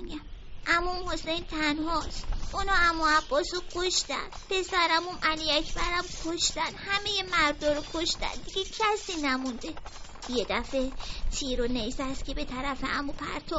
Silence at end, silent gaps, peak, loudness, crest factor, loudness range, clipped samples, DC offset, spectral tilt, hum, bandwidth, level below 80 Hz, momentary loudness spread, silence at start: 0 s; none; -10 dBFS; -29 LUFS; 20 dB; 5 LU; under 0.1%; under 0.1%; -1 dB/octave; none; 8 kHz; -40 dBFS; 11 LU; 0 s